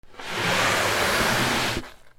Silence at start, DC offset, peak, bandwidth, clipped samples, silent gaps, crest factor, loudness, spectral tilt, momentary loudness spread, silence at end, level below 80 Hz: 0.05 s; under 0.1%; -10 dBFS; 17 kHz; under 0.1%; none; 14 dB; -22 LUFS; -2.5 dB/octave; 8 LU; 0.05 s; -46 dBFS